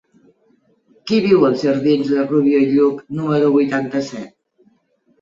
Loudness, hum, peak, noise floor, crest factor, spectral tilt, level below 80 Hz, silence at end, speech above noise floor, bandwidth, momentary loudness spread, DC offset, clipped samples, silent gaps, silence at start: -16 LUFS; none; -2 dBFS; -60 dBFS; 16 dB; -7 dB/octave; -60 dBFS; 0.95 s; 45 dB; 7.4 kHz; 12 LU; under 0.1%; under 0.1%; none; 1.05 s